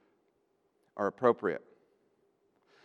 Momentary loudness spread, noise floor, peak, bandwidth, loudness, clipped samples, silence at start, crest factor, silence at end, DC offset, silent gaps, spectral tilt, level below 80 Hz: 15 LU; -75 dBFS; -10 dBFS; 6.6 kHz; -32 LUFS; under 0.1%; 0.95 s; 26 dB; 1.25 s; under 0.1%; none; -7.5 dB/octave; -86 dBFS